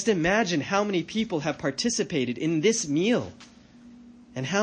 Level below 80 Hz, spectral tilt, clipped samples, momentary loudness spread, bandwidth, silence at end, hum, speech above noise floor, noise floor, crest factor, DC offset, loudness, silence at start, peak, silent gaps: -58 dBFS; -4 dB/octave; under 0.1%; 6 LU; 10 kHz; 0 s; none; 25 dB; -50 dBFS; 16 dB; under 0.1%; -26 LUFS; 0 s; -10 dBFS; none